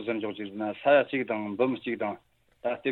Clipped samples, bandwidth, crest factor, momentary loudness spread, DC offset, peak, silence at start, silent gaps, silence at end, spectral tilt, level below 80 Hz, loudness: under 0.1%; 4.2 kHz; 20 dB; 12 LU; under 0.1%; -8 dBFS; 0 s; none; 0 s; -8 dB/octave; -74 dBFS; -29 LUFS